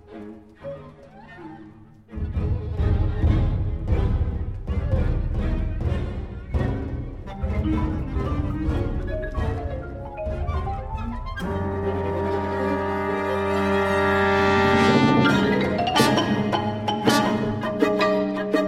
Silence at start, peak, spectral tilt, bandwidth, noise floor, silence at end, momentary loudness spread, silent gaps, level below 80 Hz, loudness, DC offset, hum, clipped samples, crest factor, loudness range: 0.1 s; -4 dBFS; -6.5 dB/octave; 15.5 kHz; -46 dBFS; 0 s; 15 LU; none; -30 dBFS; -23 LUFS; under 0.1%; none; under 0.1%; 20 dB; 9 LU